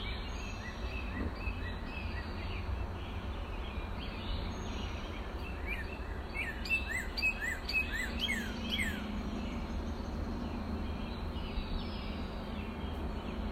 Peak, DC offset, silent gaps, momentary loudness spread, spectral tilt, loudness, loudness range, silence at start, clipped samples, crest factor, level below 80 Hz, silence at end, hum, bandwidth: -22 dBFS; under 0.1%; none; 9 LU; -5 dB/octave; -38 LUFS; 6 LU; 0 s; under 0.1%; 16 dB; -42 dBFS; 0 s; none; 16 kHz